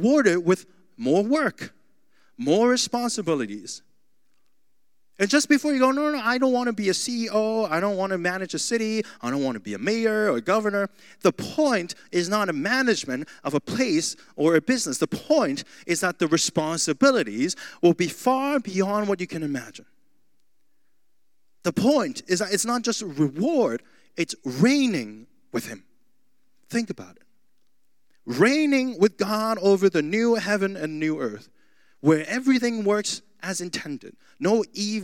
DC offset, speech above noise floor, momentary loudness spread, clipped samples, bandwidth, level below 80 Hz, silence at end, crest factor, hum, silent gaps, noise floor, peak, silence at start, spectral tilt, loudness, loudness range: 0.2%; 55 dB; 11 LU; under 0.1%; 17 kHz; -74 dBFS; 0 s; 20 dB; none; none; -78 dBFS; -4 dBFS; 0 s; -4 dB/octave; -24 LUFS; 5 LU